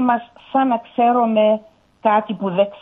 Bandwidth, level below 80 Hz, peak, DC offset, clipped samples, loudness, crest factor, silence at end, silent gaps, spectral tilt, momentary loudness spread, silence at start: 3.9 kHz; -64 dBFS; -4 dBFS; under 0.1%; under 0.1%; -18 LUFS; 14 dB; 0.05 s; none; -9 dB/octave; 7 LU; 0 s